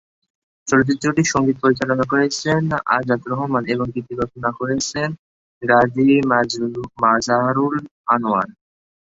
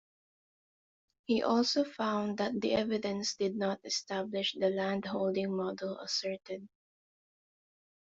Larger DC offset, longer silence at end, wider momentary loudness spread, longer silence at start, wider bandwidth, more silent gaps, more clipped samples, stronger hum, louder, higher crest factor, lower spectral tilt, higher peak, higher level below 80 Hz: neither; second, 0.6 s vs 1.5 s; about the same, 10 LU vs 8 LU; second, 0.65 s vs 1.3 s; about the same, 8 kHz vs 8 kHz; first, 5.19-5.61 s, 7.91-8.04 s vs none; neither; neither; first, -19 LUFS vs -33 LUFS; about the same, 18 dB vs 18 dB; about the same, -5 dB/octave vs -4 dB/octave; first, -2 dBFS vs -16 dBFS; first, -52 dBFS vs -72 dBFS